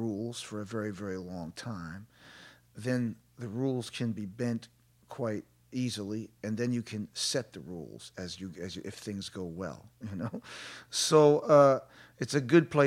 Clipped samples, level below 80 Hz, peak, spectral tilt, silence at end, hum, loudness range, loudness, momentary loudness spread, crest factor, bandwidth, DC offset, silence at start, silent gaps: under 0.1%; -68 dBFS; -8 dBFS; -5 dB/octave; 0 s; none; 11 LU; -31 LUFS; 21 LU; 22 dB; 15.5 kHz; under 0.1%; 0 s; none